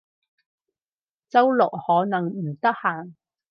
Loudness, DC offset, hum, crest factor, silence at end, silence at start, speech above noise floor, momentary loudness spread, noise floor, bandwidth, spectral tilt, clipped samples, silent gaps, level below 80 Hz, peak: -22 LUFS; under 0.1%; none; 20 dB; 0.4 s; 1.35 s; over 68 dB; 8 LU; under -90 dBFS; 6.2 kHz; -8.5 dB/octave; under 0.1%; none; -78 dBFS; -4 dBFS